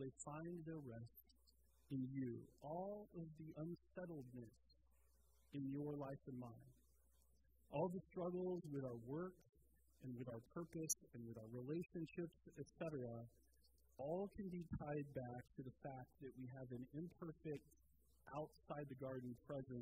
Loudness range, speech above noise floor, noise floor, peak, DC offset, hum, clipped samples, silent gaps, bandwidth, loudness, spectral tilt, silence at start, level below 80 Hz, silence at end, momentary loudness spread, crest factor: 5 LU; 26 dB; -77 dBFS; -28 dBFS; under 0.1%; none; under 0.1%; none; 15.5 kHz; -52 LUFS; -6.5 dB/octave; 0 s; -74 dBFS; 0 s; 11 LU; 24 dB